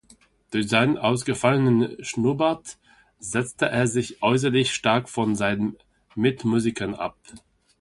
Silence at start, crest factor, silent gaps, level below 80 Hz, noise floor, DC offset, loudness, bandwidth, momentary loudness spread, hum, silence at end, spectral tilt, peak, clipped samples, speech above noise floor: 0.5 s; 20 dB; none; -56 dBFS; -57 dBFS; under 0.1%; -23 LUFS; 11.5 kHz; 10 LU; none; 0.4 s; -5 dB/octave; -4 dBFS; under 0.1%; 34 dB